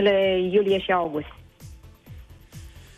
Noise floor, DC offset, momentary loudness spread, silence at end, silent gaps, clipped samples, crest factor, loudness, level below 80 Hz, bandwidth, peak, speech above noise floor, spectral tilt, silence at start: -45 dBFS; under 0.1%; 24 LU; 0.15 s; none; under 0.1%; 18 dB; -22 LUFS; -50 dBFS; 14 kHz; -8 dBFS; 23 dB; -6 dB/octave; 0 s